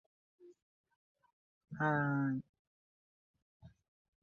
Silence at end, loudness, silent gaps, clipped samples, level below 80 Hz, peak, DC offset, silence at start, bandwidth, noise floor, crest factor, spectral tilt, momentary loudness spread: 0.55 s; -36 LUFS; 0.62-0.84 s, 0.96-1.15 s, 1.33-1.61 s, 2.49-3.34 s, 3.42-3.60 s; under 0.1%; -76 dBFS; -20 dBFS; under 0.1%; 0.45 s; 6.6 kHz; under -90 dBFS; 22 dB; -7.5 dB/octave; 11 LU